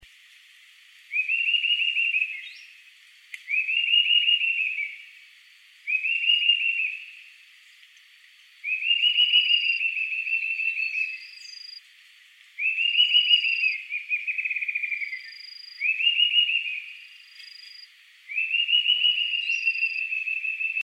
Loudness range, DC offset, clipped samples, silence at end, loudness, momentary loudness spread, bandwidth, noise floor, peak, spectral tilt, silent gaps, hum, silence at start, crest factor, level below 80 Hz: 3 LU; under 0.1%; under 0.1%; 0 s; -22 LUFS; 22 LU; 12.5 kHz; -54 dBFS; -8 dBFS; 6.5 dB/octave; none; none; 1.1 s; 18 dB; -82 dBFS